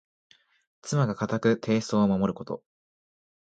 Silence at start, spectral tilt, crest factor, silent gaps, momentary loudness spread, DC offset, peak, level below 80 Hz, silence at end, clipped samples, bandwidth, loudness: 0.85 s; -6.5 dB/octave; 18 dB; none; 14 LU; under 0.1%; -10 dBFS; -60 dBFS; 1 s; under 0.1%; 9 kHz; -26 LUFS